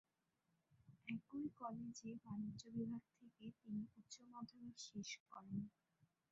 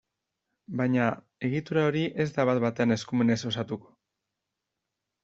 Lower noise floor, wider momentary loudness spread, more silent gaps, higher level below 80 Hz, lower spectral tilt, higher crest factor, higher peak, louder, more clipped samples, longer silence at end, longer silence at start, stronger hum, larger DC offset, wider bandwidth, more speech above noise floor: about the same, -87 dBFS vs -85 dBFS; about the same, 10 LU vs 8 LU; first, 5.20-5.26 s vs none; second, -84 dBFS vs -66 dBFS; about the same, -5.5 dB/octave vs -6.5 dB/octave; about the same, 18 dB vs 20 dB; second, -34 dBFS vs -10 dBFS; second, -52 LUFS vs -28 LUFS; neither; second, 0.25 s vs 1.45 s; about the same, 0.7 s vs 0.7 s; neither; neither; about the same, 7.6 kHz vs 7.8 kHz; second, 36 dB vs 58 dB